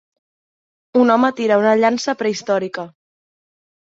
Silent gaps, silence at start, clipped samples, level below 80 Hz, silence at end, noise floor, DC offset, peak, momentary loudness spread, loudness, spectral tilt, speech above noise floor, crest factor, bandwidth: none; 0.95 s; under 0.1%; -66 dBFS; 1 s; under -90 dBFS; under 0.1%; -2 dBFS; 12 LU; -17 LUFS; -5 dB/octave; over 74 dB; 16 dB; 7.8 kHz